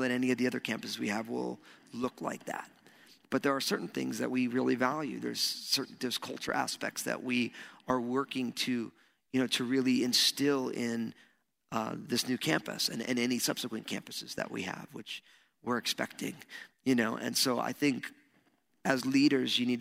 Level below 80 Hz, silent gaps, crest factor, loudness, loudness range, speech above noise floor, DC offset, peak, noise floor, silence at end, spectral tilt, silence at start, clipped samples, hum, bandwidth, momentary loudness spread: -76 dBFS; none; 22 dB; -32 LUFS; 5 LU; 38 dB; under 0.1%; -10 dBFS; -71 dBFS; 0 s; -3.5 dB/octave; 0 s; under 0.1%; none; 16 kHz; 12 LU